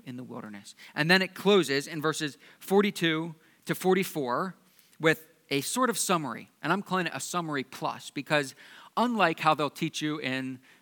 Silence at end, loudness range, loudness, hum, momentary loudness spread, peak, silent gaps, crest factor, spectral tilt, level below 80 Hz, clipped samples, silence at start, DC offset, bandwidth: 0.25 s; 3 LU; -28 LUFS; none; 15 LU; -6 dBFS; none; 24 dB; -4 dB/octave; -86 dBFS; under 0.1%; 0.05 s; under 0.1%; 19 kHz